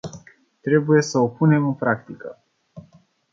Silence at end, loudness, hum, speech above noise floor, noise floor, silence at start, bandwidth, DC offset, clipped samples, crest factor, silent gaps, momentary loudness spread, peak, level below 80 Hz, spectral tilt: 0.55 s; -20 LUFS; none; 35 dB; -55 dBFS; 0.05 s; 7.6 kHz; under 0.1%; under 0.1%; 18 dB; none; 20 LU; -4 dBFS; -64 dBFS; -7 dB/octave